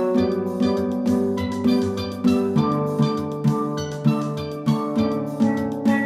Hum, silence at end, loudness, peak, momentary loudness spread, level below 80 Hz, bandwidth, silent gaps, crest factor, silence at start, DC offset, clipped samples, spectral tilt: none; 0 s; -22 LUFS; -6 dBFS; 4 LU; -56 dBFS; 14.5 kHz; none; 14 dB; 0 s; under 0.1%; under 0.1%; -7.5 dB/octave